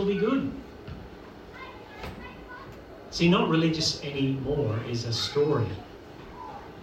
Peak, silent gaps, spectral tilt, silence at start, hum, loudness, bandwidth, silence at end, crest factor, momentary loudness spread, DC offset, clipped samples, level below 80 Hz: -10 dBFS; none; -5.5 dB/octave; 0 s; none; -26 LUFS; 14.5 kHz; 0 s; 18 dB; 21 LU; under 0.1%; under 0.1%; -52 dBFS